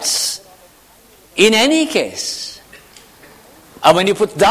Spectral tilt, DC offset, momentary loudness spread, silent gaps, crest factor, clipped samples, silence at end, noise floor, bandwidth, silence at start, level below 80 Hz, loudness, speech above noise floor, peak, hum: -2.5 dB/octave; under 0.1%; 15 LU; none; 18 dB; under 0.1%; 0 s; -47 dBFS; 16 kHz; 0 s; -52 dBFS; -15 LUFS; 34 dB; 0 dBFS; none